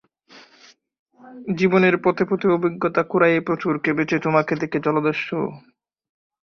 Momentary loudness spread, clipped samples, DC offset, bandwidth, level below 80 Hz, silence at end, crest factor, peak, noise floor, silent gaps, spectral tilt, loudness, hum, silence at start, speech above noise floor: 9 LU; under 0.1%; under 0.1%; 6.6 kHz; -62 dBFS; 1 s; 18 dB; -2 dBFS; -53 dBFS; 0.99-1.06 s; -7.5 dB/octave; -20 LUFS; none; 0.35 s; 33 dB